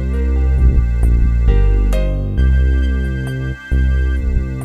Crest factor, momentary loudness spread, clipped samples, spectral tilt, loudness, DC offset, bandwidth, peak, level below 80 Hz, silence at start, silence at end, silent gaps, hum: 12 dB; 6 LU; under 0.1%; -8 dB/octave; -17 LUFS; under 0.1%; 4.6 kHz; -2 dBFS; -14 dBFS; 0 s; 0 s; none; none